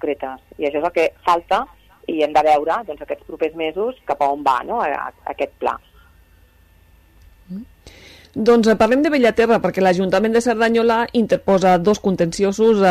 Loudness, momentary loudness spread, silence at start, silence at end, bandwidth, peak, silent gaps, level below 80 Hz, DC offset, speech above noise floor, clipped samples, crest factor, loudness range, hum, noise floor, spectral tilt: -18 LUFS; 14 LU; 0.05 s; 0 s; 14 kHz; -2 dBFS; none; -48 dBFS; under 0.1%; 34 dB; under 0.1%; 16 dB; 10 LU; none; -51 dBFS; -5.5 dB/octave